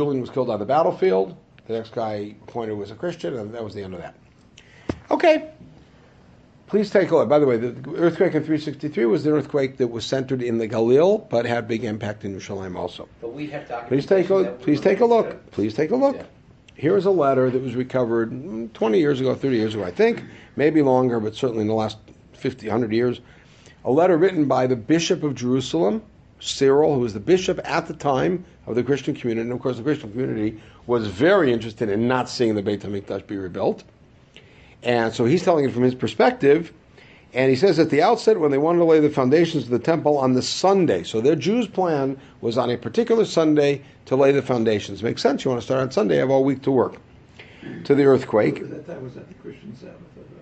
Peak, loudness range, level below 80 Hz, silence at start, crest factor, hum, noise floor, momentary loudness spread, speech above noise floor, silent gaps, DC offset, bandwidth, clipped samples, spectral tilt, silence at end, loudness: -4 dBFS; 6 LU; -54 dBFS; 0 s; 16 dB; none; -51 dBFS; 14 LU; 30 dB; none; under 0.1%; 8.8 kHz; under 0.1%; -6.5 dB/octave; 0 s; -21 LUFS